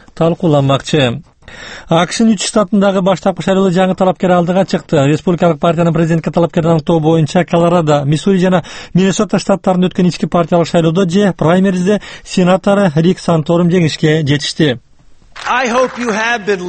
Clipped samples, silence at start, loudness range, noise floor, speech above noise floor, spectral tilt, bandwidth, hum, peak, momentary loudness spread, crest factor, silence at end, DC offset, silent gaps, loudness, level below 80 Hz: under 0.1%; 0.15 s; 1 LU; -41 dBFS; 29 dB; -6 dB/octave; 8.8 kHz; none; 0 dBFS; 4 LU; 12 dB; 0 s; under 0.1%; none; -12 LUFS; -42 dBFS